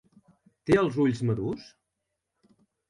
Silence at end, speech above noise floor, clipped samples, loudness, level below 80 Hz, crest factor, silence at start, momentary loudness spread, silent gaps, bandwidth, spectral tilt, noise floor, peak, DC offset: 1.25 s; 57 dB; under 0.1%; -26 LUFS; -58 dBFS; 20 dB; 0.65 s; 15 LU; none; 11.5 kHz; -7.5 dB/octave; -83 dBFS; -10 dBFS; under 0.1%